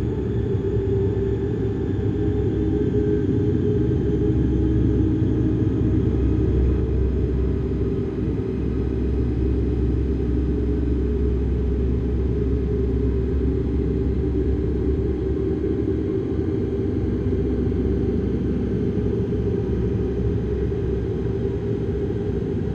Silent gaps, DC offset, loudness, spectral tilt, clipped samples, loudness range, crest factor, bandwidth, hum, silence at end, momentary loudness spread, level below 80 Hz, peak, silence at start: none; under 0.1%; -23 LUFS; -10.5 dB/octave; under 0.1%; 3 LU; 14 dB; 5 kHz; none; 0 s; 4 LU; -26 dBFS; -8 dBFS; 0 s